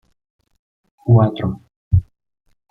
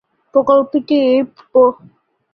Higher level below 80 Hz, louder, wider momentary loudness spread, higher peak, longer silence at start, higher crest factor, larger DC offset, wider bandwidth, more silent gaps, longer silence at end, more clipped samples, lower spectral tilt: first, -38 dBFS vs -58 dBFS; second, -18 LUFS vs -14 LUFS; first, 14 LU vs 4 LU; about the same, -2 dBFS vs -2 dBFS; first, 1.05 s vs 0.35 s; about the same, 18 dB vs 14 dB; neither; second, 3.8 kHz vs 5.4 kHz; first, 1.76-1.91 s vs none; about the same, 0.7 s vs 0.6 s; neither; first, -11 dB/octave vs -7.5 dB/octave